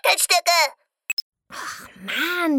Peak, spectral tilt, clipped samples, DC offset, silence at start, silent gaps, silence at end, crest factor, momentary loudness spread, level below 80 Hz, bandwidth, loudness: -2 dBFS; 0 dB/octave; under 0.1%; under 0.1%; 0.05 s; 1.13-1.32 s; 0 s; 20 dB; 18 LU; -70 dBFS; 19 kHz; -20 LUFS